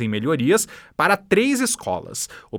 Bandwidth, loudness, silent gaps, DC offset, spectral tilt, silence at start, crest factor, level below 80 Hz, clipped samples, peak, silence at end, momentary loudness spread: over 20 kHz; -21 LUFS; none; under 0.1%; -4 dB/octave; 0 s; 18 dB; -58 dBFS; under 0.1%; -2 dBFS; 0 s; 10 LU